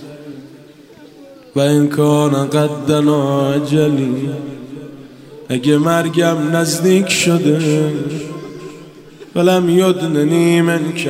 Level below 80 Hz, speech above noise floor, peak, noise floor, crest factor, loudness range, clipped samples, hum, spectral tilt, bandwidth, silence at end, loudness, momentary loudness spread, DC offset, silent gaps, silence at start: -60 dBFS; 27 dB; 0 dBFS; -41 dBFS; 14 dB; 2 LU; under 0.1%; none; -5.5 dB/octave; 16 kHz; 0 s; -14 LUFS; 19 LU; under 0.1%; none; 0 s